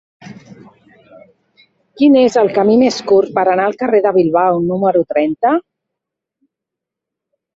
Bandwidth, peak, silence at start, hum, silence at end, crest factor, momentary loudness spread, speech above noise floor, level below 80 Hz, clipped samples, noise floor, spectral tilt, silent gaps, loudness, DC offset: 7.8 kHz; -2 dBFS; 0.25 s; none; 1.95 s; 14 dB; 5 LU; 70 dB; -58 dBFS; under 0.1%; -82 dBFS; -6 dB/octave; none; -13 LUFS; under 0.1%